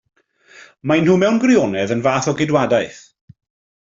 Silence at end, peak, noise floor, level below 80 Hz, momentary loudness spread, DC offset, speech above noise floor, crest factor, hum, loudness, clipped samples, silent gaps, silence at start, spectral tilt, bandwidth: 0.85 s; -2 dBFS; -47 dBFS; -56 dBFS; 6 LU; under 0.1%; 31 dB; 16 dB; none; -16 LUFS; under 0.1%; none; 0.85 s; -6 dB/octave; 7.6 kHz